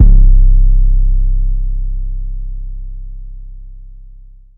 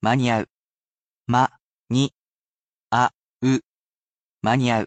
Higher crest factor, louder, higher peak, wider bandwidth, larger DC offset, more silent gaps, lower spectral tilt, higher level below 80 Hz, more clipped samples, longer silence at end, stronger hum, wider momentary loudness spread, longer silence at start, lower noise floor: second, 10 dB vs 18 dB; first, -16 LUFS vs -23 LUFS; first, 0 dBFS vs -6 dBFS; second, 0.6 kHz vs 8.8 kHz; neither; second, none vs 0.51-1.25 s, 1.62-1.84 s, 2.15-2.88 s, 3.15-3.40 s, 3.66-4.40 s; first, -13.5 dB/octave vs -6 dB/octave; first, -10 dBFS vs -60 dBFS; first, 2% vs under 0.1%; first, 0.7 s vs 0 s; neither; first, 23 LU vs 7 LU; about the same, 0 s vs 0 s; second, -36 dBFS vs under -90 dBFS